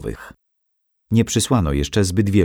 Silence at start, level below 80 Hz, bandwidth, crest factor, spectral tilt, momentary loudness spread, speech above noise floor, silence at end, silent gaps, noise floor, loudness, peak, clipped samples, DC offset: 0 s; -34 dBFS; 17.5 kHz; 16 dB; -5.5 dB/octave; 10 LU; 53 dB; 0 s; none; -71 dBFS; -19 LUFS; -4 dBFS; under 0.1%; under 0.1%